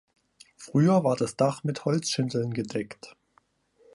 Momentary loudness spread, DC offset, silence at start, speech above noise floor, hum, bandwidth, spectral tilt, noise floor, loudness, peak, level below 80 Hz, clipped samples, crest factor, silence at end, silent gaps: 14 LU; under 0.1%; 0.6 s; 41 dB; none; 11.5 kHz; -6 dB/octave; -67 dBFS; -26 LUFS; -10 dBFS; -68 dBFS; under 0.1%; 18 dB; 0.85 s; none